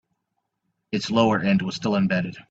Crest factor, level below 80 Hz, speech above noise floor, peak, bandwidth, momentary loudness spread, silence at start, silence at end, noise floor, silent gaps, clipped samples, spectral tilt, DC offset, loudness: 18 dB; -60 dBFS; 56 dB; -6 dBFS; 7.8 kHz; 8 LU; 0.9 s; 0.1 s; -78 dBFS; none; under 0.1%; -6 dB/octave; under 0.1%; -23 LUFS